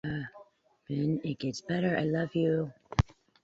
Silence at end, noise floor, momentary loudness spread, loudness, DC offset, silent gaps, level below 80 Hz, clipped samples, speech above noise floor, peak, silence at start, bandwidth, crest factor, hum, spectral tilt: 0.4 s; -60 dBFS; 8 LU; -32 LUFS; under 0.1%; none; -48 dBFS; under 0.1%; 29 dB; -10 dBFS; 0.05 s; 8 kHz; 22 dB; none; -7 dB/octave